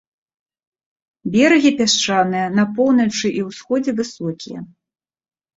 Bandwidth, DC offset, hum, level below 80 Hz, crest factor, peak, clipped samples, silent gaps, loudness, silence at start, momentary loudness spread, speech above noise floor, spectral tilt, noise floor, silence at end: 8 kHz; under 0.1%; none; -60 dBFS; 18 dB; -2 dBFS; under 0.1%; none; -17 LUFS; 1.25 s; 15 LU; 71 dB; -4 dB/octave; -88 dBFS; 0.9 s